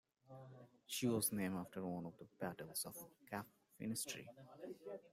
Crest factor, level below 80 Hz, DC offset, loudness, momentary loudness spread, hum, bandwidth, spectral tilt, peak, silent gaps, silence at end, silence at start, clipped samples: 20 dB; -80 dBFS; under 0.1%; -45 LUFS; 20 LU; none; 16 kHz; -4 dB/octave; -26 dBFS; none; 0.05 s; 0.3 s; under 0.1%